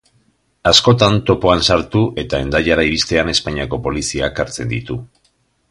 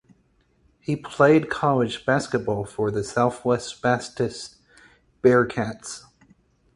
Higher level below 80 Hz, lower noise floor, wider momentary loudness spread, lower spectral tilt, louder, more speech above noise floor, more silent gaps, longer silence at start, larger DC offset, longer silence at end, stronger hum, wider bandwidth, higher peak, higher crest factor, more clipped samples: first, -34 dBFS vs -56 dBFS; about the same, -61 dBFS vs -64 dBFS; second, 11 LU vs 18 LU; second, -4.5 dB/octave vs -6 dB/octave; first, -15 LUFS vs -23 LUFS; first, 46 dB vs 41 dB; neither; second, 0.65 s vs 0.9 s; neither; about the same, 0.65 s vs 0.75 s; neither; about the same, 11.5 kHz vs 11.5 kHz; first, 0 dBFS vs -4 dBFS; about the same, 16 dB vs 20 dB; neither